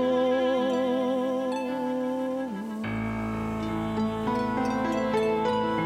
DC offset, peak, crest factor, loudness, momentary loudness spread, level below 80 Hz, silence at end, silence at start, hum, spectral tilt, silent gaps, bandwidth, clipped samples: under 0.1%; -14 dBFS; 12 dB; -28 LUFS; 6 LU; -50 dBFS; 0 s; 0 s; none; -6.5 dB/octave; none; 14.5 kHz; under 0.1%